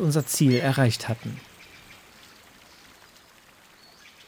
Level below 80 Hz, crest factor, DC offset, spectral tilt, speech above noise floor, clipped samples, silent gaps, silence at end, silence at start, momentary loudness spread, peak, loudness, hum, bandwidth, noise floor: -66 dBFS; 18 dB; under 0.1%; -5.5 dB/octave; 31 dB; under 0.1%; none; 2.35 s; 0 s; 26 LU; -8 dBFS; -23 LUFS; none; over 20 kHz; -54 dBFS